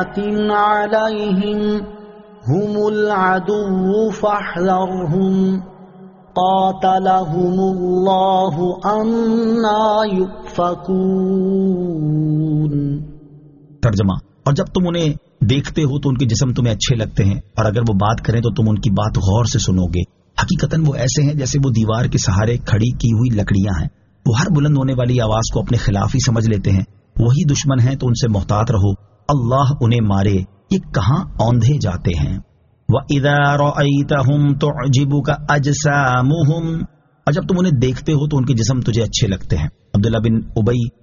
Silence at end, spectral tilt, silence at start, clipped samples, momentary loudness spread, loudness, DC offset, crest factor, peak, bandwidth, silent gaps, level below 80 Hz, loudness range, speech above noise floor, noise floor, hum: 0.1 s; -6.5 dB/octave; 0 s; under 0.1%; 6 LU; -17 LUFS; under 0.1%; 14 dB; -2 dBFS; 7.4 kHz; none; -34 dBFS; 2 LU; 27 dB; -42 dBFS; none